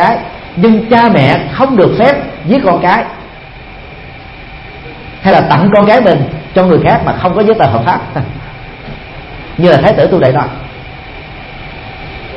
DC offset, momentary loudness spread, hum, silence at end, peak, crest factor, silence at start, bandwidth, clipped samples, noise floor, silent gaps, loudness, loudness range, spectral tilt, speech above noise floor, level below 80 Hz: under 0.1%; 21 LU; none; 0 s; 0 dBFS; 10 dB; 0 s; 7 kHz; 0.4%; -30 dBFS; none; -9 LUFS; 4 LU; -8.5 dB/octave; 22 dB; -34 dBFS